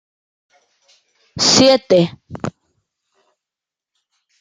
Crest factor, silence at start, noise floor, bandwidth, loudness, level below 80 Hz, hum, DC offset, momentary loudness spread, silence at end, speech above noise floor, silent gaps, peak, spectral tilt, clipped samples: 20 dB; 1.35 s; -87 dBFS; 9.6 kHz; -13 LUFS; -58 dBFS; none; under 0.1%; 19 LU; 1.9 s; 73 dB; none; 0 dBFS; -3.5 dB/octave; under 0.1%